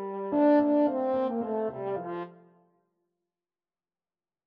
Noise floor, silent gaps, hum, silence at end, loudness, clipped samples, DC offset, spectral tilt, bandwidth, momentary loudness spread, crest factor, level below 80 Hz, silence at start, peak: under -90 dBFS; none; none; 2.15 s; -27 LUFS; under 0.1%; under 0.1%; -10 dB/octave; 5 kHz; 14 LU; 16 dB; -74 dBFS; 0 s; -14 dBFS